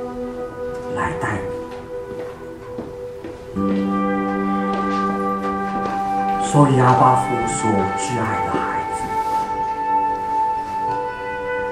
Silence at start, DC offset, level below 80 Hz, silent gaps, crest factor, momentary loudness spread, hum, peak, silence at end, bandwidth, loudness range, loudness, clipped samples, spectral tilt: 0 s; under 0.1%; -46 dBFS; none; 20 dB; 16 LU; none; -2 dBFS; 0 s; 15 kHz; 8 LU; -20 LUFS; under 0.1%; -6 dB/octave